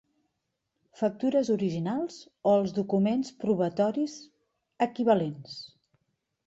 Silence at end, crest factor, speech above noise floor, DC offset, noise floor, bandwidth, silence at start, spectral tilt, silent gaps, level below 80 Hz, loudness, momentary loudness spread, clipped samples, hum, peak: 0.8 s; 18 dB; 54 dB; under 0.1%; -81 dBFS; 8 kHz; 1 s; -7 dB/octave; none; -70 dBFS; -28 LUFS; 14 LU; under 0.1%; none; -10 dBFS